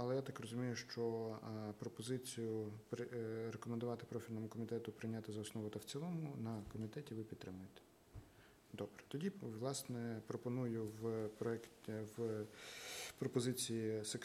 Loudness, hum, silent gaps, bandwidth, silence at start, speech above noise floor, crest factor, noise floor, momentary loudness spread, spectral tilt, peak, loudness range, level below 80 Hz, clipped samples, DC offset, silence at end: -46 LUFS; none; none; 16 kHz; 0 s; 21 dB; 20 dB; -66 dBFS; 8 LU; -5.5 dB/octave; -26 dBFS; 5 LU; -76 dBFS; under 0.1%; under 0.1%; 0 s